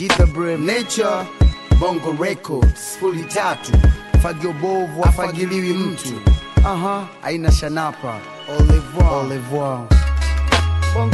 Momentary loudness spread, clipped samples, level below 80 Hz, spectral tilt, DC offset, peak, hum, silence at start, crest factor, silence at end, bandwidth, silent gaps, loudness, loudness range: 7 LU; under 0.1%; -20 dBFS; -6 dB/octave; under 0.1%; -2 dBFS; none; 0 s; 14 dB; 0 s; 12.5 kHz; none; -18 LUFS; 1 LU